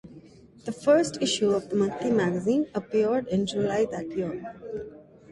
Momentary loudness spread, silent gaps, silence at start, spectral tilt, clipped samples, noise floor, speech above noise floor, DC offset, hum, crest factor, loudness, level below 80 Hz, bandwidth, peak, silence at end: 15 LU; none; 0.05 s; -5 dB/octave; under 0.1%; -50 dBFS; 25 dB; under 0.1%; none; 18 dB; -26 LUFS; -60 dBFS; 11.5 kHz; -10 dBFS; 0 s